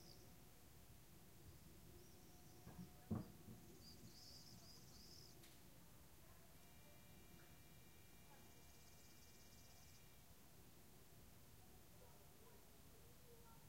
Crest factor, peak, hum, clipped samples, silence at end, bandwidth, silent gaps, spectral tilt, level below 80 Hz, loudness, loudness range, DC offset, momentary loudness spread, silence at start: 28 dB; -36 dBFS; none; under 0.1%; 0 s; 16 kHz; none; -4.5 dB/octave; -74 dBFS; -63 LUFS; 8 LU; under 0.1%; 6 LU; 0 s